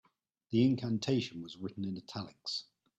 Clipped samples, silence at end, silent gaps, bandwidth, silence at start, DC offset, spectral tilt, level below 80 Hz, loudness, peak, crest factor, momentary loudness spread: under 0.1%; 0.35 s; none; 8.4 kHz; 0.5 s; under 0.1%; -6.5 dB/octave; -72 dBFS; -35 LUFS; -18 dBFS; 18 dB; 13 LU